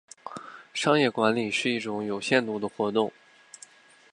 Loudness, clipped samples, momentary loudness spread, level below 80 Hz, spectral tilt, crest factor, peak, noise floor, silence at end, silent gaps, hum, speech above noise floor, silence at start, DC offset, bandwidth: -26 LUFS; under 0.1%; 19 LU; -72 dBFS; -4.5 dB/octave; 22 dB; -6 dBFS; -53 dBFS; 1.05 s; none; none; 27 dB; 0.25 s; under 0.1%; 11.5 kHz